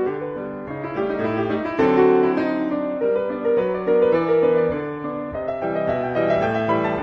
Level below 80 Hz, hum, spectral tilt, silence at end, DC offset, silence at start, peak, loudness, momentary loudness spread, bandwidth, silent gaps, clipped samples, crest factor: -52 dBFS; none; -8.5 dB/octave; 0 s; under 0.1%; 0 s; -4 dBFS; -21 LUFS; 11 LU; 6.4 kHz; none; under 0.1%; 16 dB